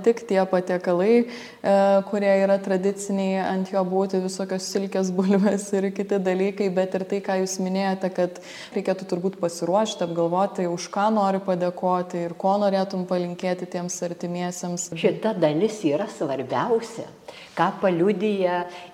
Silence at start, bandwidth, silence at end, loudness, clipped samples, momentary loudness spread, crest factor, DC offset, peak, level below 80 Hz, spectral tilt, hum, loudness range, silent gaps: 0 s; 13.5 kHz; 0 s; -24 LUFS; under 0.1%; 8 LU; 18 dB; under 0.1%; -4 dBFS; -72 dBFS; -5.5 dB/octave; none; 4 LU; none